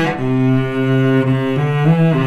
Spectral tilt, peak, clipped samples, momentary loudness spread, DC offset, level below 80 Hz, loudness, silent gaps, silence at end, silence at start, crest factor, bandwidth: -8.5 dB/octave; -2 dBFS; under 0.1%; 3 LU; 0.9%; -50 dBFS; -15 LUFS; none; 0 s; 0 s; 12 dB; 8.4 kHz